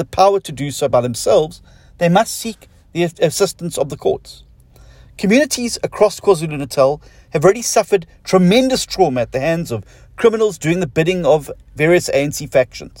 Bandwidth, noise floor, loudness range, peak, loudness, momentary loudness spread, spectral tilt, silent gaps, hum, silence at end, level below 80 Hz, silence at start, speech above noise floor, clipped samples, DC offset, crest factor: 16.5 kHz; -44 dBFS; 4 LU; 0 dBFS; -16 LUFS; 9 LU; -5 dB/octave; none; none; 0.1 s; -44 dBFS; 0 s; 28 dB; under 0.1%; under 0.1%; 16 dB